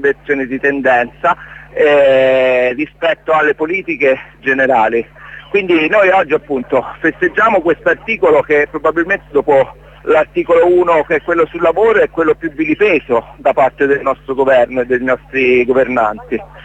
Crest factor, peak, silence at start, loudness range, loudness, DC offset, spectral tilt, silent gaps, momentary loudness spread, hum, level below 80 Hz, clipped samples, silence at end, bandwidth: 12 dB; 0 dBFS; 0 s; 1 LU; -13 LUFS; under 0.1%; -6.5 dB/octave; none; 7 LU; none; -44 dBFS; under 0.1%; 0.05 s; 8 kHz